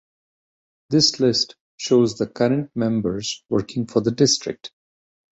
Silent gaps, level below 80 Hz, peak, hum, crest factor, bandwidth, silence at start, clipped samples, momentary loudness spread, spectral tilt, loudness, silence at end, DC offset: 1.60-1.78 s; -56 dBFS; -4 dBFS; none; 18 dB; 8.2 kHz; 0.9 s; under 0.1%; 10 LU; -4.5 dB/octave; -20 LUFS; 0.7 s; under 0.1%